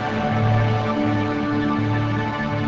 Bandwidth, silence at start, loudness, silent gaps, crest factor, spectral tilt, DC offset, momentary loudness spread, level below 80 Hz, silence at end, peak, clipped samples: 7.4 kHz; 0 s; -21 LUFS; none; 14 dB; -8 dB/octave; 0.3%; 4 LU; -42 dBFS; 0 s; -8 dBFS; under 0.1%